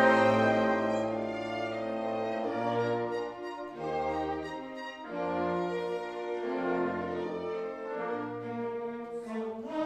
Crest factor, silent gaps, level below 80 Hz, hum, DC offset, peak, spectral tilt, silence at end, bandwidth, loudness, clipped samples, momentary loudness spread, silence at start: 20 dB; none; -64 dBFS; none; under 0.1%; -12 dBFS; -6.5 dB/octave; 0 s; 10 kHz; -33 LUFS; under 0.1%; 11 LU; 0 s